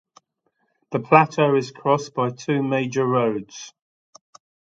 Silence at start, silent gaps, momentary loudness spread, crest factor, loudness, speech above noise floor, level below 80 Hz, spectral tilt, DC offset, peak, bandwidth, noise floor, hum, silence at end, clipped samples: 0.9 s; none; 15 LU; 22 dB; -21 LUFS; 51 dB; -68 dBFS; -6 dB/octave; under 0.1%; 0 dBFS; 7.8 kHz; -71 dBFS; none; 1.05 s; under 0.1%